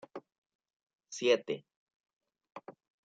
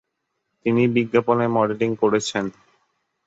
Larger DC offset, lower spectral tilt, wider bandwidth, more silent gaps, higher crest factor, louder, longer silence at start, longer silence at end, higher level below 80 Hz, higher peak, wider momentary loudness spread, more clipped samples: neither; second, -3 dB/octave vs -6 dB/octave; first, 9 kHz vs 8 kHz; first, 0.38-0.42 s, 0.55-0.59 s, 0.76-0.87 s, 1.76-1.87 s, 1.94-2.04 s, 2.13-2.21 s vs none; first, 24 dB vs 18 dB; second, -32 LUFS vs -21 LUFS; second, 0.15 s vs 0.65 s; second, 0.35 s vs 0.75 s; second, -90 dBFS vs -62 dBFS; second, -14 dBFS vs -4 dBFS; first, 22 LU vs 9 LU; neither